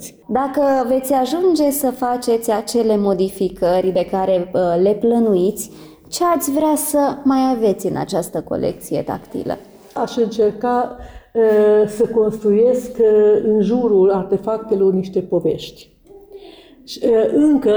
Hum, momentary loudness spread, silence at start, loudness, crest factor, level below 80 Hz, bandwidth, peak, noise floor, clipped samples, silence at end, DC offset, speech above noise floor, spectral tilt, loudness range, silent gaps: none; 11 LU; 0 s; -17 LUFS; 10 dB; -48 dBFS; over 20 kHz; -6 dBFS; -41 dBFS; under 0.1%; 0 s; under 0.1%; 25 dB; -5.5 dB/octave; 5 LU; none